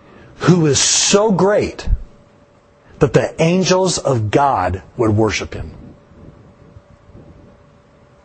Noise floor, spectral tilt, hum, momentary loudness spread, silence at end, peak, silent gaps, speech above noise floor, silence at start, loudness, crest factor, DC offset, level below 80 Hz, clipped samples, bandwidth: -49 dBFS; -4.5 dB/octave; none; 13 LU; 1.05 s; 0 dBFS; none; 35 dB; 0.4 s; -15 LUFS; 18 dB; under 0.1%; -32 dBFS; under 0.1%; 8.8 kHz